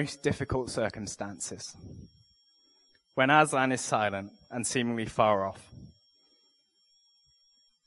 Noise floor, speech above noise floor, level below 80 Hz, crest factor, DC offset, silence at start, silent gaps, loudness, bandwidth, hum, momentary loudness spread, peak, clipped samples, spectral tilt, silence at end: -69 dBFS; 40 dB; -58 dBFS; 26 dB; under 0.1%; 0 s; none; -29 LUFS; 11.5 kHz; none; 19 LU; -6 dBFS; under 0.1%; -4 dB/octave; 2 s